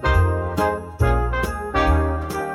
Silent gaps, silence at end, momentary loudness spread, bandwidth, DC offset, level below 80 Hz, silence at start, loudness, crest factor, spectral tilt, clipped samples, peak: none; 0 s; 5 LU; 14 kHz; under 0.1%; -26 dBFS; 0 s; -21 LUFS; 14 dB; -6.5 dB/octave; under 0.1%; -6 dBFS